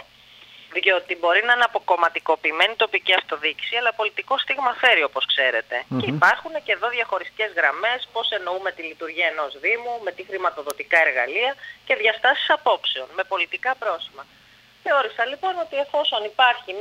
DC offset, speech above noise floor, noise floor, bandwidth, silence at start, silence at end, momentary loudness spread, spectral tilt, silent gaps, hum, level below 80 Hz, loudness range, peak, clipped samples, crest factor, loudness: under 0.1%; 27 dB; -49 dBFS; 16 kHz; 0.6 s; 0 s; 9 LU; -3.5 dB/octave; none; none; -70 dBFS; 4 LU; -2 dBFS; under 0.1%; 20 dB; -21 LUFS